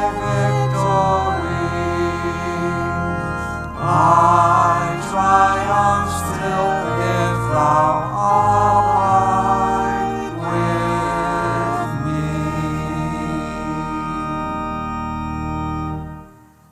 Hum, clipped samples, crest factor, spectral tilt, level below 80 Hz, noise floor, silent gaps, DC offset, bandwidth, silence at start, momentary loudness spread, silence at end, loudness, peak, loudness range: none; under 0.1%; 18 dB; -6.5 dB/octave; -38 dBFS; -44 dBFS; none; under 0.1%; 15 kHz; 0 s; 10 LU; 0.4 s; -18 LUFS; 0 dBFS; 8 LU